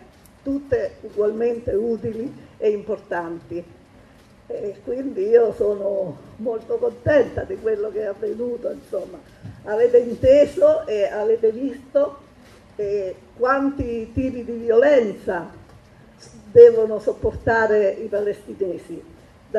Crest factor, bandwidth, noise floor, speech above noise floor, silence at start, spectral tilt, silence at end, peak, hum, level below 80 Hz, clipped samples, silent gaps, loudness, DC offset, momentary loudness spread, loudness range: 20 dB; 7.8 kHz; -49 dBFS; 29 dB; 0.45 s; -7 dB/octave; 0 s; 0 dBFS; none; -46 dBFS; under 0.1%; none; -20 LUFS; under 0.1%; 15 LU; 7 LU